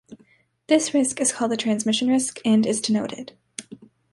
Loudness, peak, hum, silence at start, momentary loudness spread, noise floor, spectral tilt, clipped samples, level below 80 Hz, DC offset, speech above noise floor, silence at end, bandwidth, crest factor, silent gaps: -22 LUFS; -6 dBFS; none; 0.1 s; 18 LU; -59 dBFS; -3.5 dB/octave; under 0.1%; -68 dBFS; under 0.1%; 38 dB; 0.35 s; 11.5 kHz; 18 dB; none